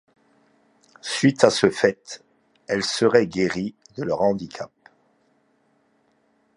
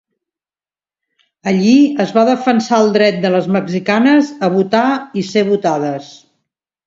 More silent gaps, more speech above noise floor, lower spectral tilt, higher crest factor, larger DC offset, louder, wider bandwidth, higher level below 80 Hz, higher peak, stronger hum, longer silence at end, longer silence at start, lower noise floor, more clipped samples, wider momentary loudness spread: neither; second, 44 dB vs over 77 dB; second, -4.5 dB/octave vs -6 dB/octave; first, 24 dB vs 14 dB; neither; second, -21 LUFS vs -13 LUFS; first, 11.5 kHz vs 7.8 kHz; about the same, -60 dBFS vs -62 dBFS; about the same, 0 dBFS vs 0 dBFS; neither; first, 1.9 s vs 0.7 s; second, 1.05 s vs 1.45 s; second, -65 dBFS vs under -90 dBFS; neither; first, 19 LU vs 7 LU